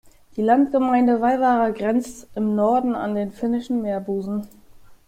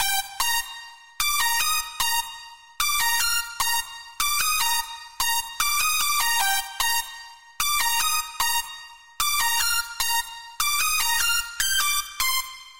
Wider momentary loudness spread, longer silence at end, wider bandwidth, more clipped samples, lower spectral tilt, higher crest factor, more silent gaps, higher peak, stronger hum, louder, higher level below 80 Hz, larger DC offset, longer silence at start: first, 9 LU vs 6 LU; first, 0.15 s vs 0 s; second, 13.5 kHz vs 16 kHz; neither; first, -7 dB/octave vs 3.5 dB/octave; about the same, 16 dB vs 16 dB; neither; first, -6 dBFS vs -10 dBFS; neither; about the same, -21 LUFS vs -22 LUFS; second, -54 dBFS vs -48 dBFS; second, under 0.1% vs 1%; first, 0.35 s vs 0 s